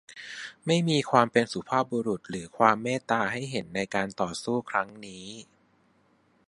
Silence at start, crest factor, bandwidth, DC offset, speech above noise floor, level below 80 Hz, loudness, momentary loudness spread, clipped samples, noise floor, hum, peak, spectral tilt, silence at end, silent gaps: 0.1 s; 24 dB; 11.5 kHz; under 0.1%; 38 dB; -66 dBFS; -27 LUFS; 18 LU; under 0.1%; -65 dBFS; none; -4 dBFS; -5 dB/octave; 1.05 s; none